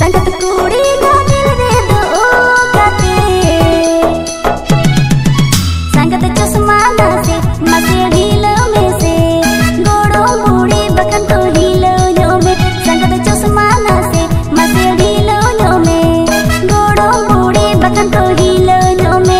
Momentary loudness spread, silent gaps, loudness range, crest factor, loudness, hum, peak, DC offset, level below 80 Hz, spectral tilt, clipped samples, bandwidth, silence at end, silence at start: 3 LU; none; 1 LU; 8 dB; -9 LUFS; none; 0 dBFS; under 0.1%; -22 dBFS; -5 dB/octave; 0.6%; 16.5 kHz; 0 s; 0 s